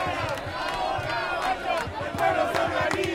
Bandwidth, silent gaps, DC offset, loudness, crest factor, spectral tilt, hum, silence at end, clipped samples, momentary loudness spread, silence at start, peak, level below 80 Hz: 17 kHz; none; under 0.1%; -27 LUFS; 18 dB; -4.5 dB/octave; none; 0 s; under 0.1%; 6 LU; 0 s; -10 dBFS; -50 dBFS